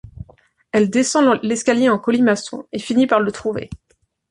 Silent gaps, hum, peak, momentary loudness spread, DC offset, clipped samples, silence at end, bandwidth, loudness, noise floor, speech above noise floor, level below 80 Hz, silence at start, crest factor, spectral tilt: none; none; -2 dBFS; 12 LU; under 0.1%; under 0.1%; 0.55 s; 11 kHz; -18 LUFS; -53 dBFS; 36 dB; -50 dBFS; 0.05 s; 16 dB; -4.5 dB/octave